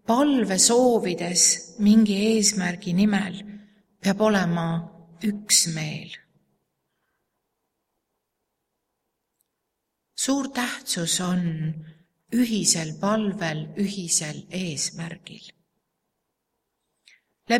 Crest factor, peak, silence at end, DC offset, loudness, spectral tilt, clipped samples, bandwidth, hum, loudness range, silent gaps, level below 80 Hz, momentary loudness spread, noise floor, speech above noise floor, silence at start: 22 dB; -4 dBFS; 0 s; under 0.1%; -22 LUFS; -3.5 dB/octave; under 0.1%; 16 kHz; none; 11 LU; none; -64 dBFS; 17 LU; -80 dBFS; 57 dB; 0.1 s